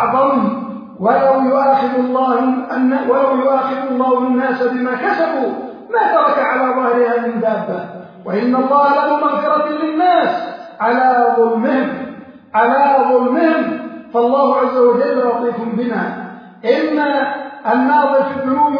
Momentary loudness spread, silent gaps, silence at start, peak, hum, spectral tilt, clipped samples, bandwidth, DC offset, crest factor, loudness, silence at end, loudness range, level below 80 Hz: 9 LU; none; 0 s; 0 dBFS; none; -8 dB/octave; under 0.1%; 5.2 kHz; under 0.1%; 14 dB; -15 LUFS; 0 s; 2 LU; -64 dBFS